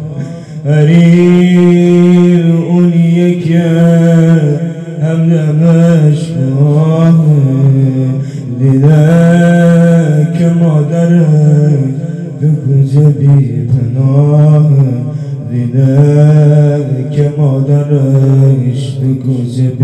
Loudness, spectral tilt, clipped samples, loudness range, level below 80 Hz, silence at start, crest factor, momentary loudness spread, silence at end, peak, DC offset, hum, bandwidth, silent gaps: -8 LUFS; -9 dB/octave; 2%; 2 LU; -48 dBFS; 0 s; 8 dB; 8 LU; 0 s; 0 dBFS; under 0.1%; none; 8.8 kHz; none